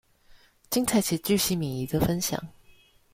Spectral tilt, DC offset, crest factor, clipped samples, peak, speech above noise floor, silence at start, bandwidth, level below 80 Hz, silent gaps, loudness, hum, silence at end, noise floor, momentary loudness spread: -4.5 dB/octave; under 0.1%; 16 dB; under 0.1%; -12 dBFS; 31 dB; 0.35 s; 16.5 kHz; -50 dBFS; none; -26 LUFS; none; 0.65 s; -57 dBFS; 6 LU